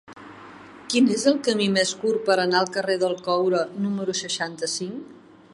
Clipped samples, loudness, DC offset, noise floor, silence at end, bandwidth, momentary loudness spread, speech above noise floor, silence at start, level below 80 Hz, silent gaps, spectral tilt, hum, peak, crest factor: under 0.1%; -23 LUFS; under 0.1%; -44 dBFS; 0.35 s; 11.5 kHz; 22 LU; 21 dB; 0.1 s; -70 dBFS; none; -3.5 dB/octave; none; -4 dBFS; 18 dB